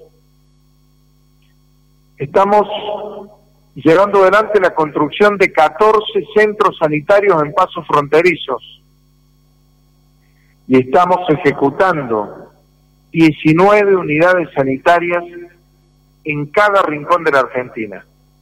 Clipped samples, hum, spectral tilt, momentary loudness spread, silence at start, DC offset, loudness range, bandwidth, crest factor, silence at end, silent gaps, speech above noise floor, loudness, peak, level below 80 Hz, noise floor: under 0.1%; none; -6.5 dB/octave; 13 LU; 2.2 s; under 0.1%; 5 LU; 14 kHz; 12 dB; 0.4 s; none; 39 dB; -13 LUFS; -2 dBFS; -50 dBFS; -52 dBFS